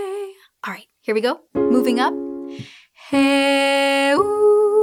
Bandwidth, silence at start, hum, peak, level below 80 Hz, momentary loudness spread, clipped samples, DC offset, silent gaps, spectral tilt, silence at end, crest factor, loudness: 16 kHz; 0 s; none; -4 dBFS; -60 dBFS; 16 LU; under 0.1%; under 0.1%; none; -3.5 dB/octave; 0 s; 14 dB; -18 LUFS